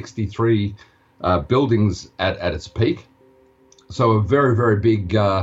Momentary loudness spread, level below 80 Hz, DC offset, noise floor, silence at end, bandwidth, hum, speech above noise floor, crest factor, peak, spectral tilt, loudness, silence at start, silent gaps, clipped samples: 10 LU; -42 dBFS; under 0.1%; -53 dBFS; 0 s; 7.8 kHz; none; 35 dB; 14 dB; -4 dBFS; -7.5 dB/octave; -20 LUFS; 0 s; none; under 0.1%